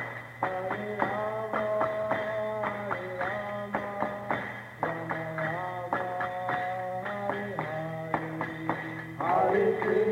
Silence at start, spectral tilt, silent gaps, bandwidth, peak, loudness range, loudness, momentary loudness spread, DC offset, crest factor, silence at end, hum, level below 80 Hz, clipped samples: 0 s; -7 dB/octave; none; 16 kHz; -12 dBFS; 3 LU; -31 LUFS; 8 LU; under 0.1%; 20 dB; 0 s; none; -64 dBFS; under 0.1%